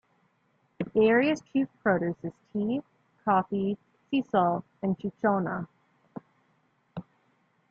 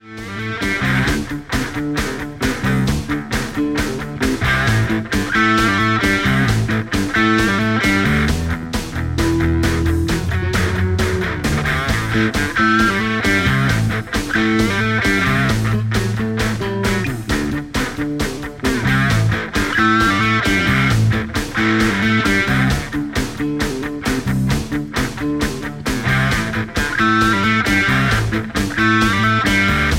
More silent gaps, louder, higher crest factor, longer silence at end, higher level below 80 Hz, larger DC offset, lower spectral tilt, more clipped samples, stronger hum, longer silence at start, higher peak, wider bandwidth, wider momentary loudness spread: neither; second, -28 LUFS vs -17 LUFS; about the same, 18 dB vs 14 dB; first, 0.7 s vs 0 s; second, -68 dBFS vs -30 dBFS; neither; first, -7.5 dB/octave vs -5 dB/octave; neither; neither; first, 0.8 s vs 0.05 s; second, -10 dBFS vs -4 dBFS; second, 7.4 kHz vs 16.5 kHz; first, 20 LU vs 8 LU